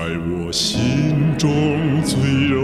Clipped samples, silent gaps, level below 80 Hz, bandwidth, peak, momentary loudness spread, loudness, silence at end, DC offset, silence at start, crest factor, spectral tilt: under 0.1%; none; -40 dBFS; 14.5 kHz; -6 dBFS; 4 LU; -18 LUFS; 0 s; under 0.1%; 0 s; 12 dB; -5.5 dB/octave